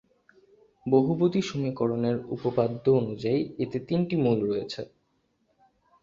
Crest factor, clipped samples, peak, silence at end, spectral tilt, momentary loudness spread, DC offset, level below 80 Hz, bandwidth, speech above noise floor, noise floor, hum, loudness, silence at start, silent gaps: 20 dB; under 0.1%; -8 dBFS; 1.2 s; -8 dB/octave; 8 LU; under 0.1%; -62 dBFS; 7.6 kHz; 46 dB; -72 dBFS; none; -27 LUFS; 0.85 s; none